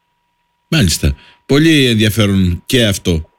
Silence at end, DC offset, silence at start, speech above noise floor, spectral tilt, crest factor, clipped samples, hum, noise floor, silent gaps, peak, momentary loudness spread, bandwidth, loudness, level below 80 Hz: 0.15 s; under 0.1%; 0.7 s; 52 dB; -5 dB/octave; 12 dB; under 0.1%; none; -64 dBFS; none; -2 dBFS; 7 LU; 17 kHz; -13 LUFS; -28 dBFS